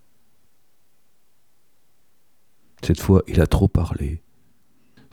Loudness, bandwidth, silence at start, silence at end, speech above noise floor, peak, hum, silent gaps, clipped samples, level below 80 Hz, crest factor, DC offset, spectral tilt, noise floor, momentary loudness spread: -20 LUFS; 16.5 kHz; 2.8 s; 0.95 s; 50 dB; -2 dBFS; none; none; under 0.1%; -32 dBFS; 22 dB; 0.3%; -7.5 dB/octave; -68 dBFS; 12 LU